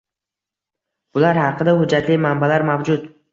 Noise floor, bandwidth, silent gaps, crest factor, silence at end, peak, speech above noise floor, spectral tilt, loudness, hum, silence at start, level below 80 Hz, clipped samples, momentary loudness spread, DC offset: -87 dBFS; 7.6 kHz; none; 16 dB; 0.25 s; -2 dBFS; 70 dB; -7.5 dB/octave; -17 LUFS; none; 1.15 s; -56 dBFS; under 0.1%; 6 LU; under 0.1%